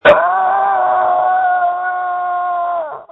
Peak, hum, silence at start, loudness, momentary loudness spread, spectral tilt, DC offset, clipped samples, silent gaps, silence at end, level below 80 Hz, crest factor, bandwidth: 0 dBFS; none; 0.05 s; -15 LUFS; 6 LU; -5.5 dB/octave; under 0.1%; under 0.1%; none; 0.1 s; -54 dBFS; 14 dB; 4.1 kHz